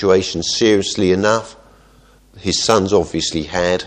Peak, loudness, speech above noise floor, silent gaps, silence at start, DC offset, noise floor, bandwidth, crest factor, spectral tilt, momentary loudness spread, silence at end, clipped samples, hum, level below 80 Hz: 0 dBFS; -16 LUFS; 33 dB; none; 0 s; under 0.1%; -49 dBFS; 12.5 kHz; 18 dB; -4 dB/octave; 6 LU; 0 s; under 0.1%; none; -44 dBFS